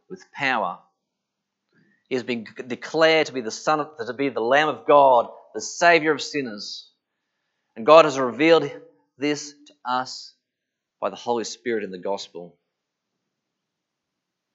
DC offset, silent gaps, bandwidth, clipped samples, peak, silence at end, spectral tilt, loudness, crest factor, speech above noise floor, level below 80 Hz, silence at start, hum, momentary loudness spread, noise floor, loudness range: under 0.1%; none; 8 kHz; under 0.1%; 0 dBFS; 2.05 s; -3.5 dB/octave; -21 LUFS; 24 dB; 61 dB; -84 dBFS; 0.1 s; none; 19 LU; -83 dBFS; 11 LU